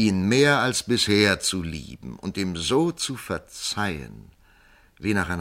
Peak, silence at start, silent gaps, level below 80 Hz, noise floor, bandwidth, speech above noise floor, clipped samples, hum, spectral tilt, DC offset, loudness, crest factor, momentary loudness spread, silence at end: -4 dBFS; 0 s; none; -48 dBFS; -56 dBFS; 16 kHz; 32 dB; under 0.1%; none; -4 dB/octave; under 0.1%; -23 LUFS; 20 dB; 16 LU; 0 s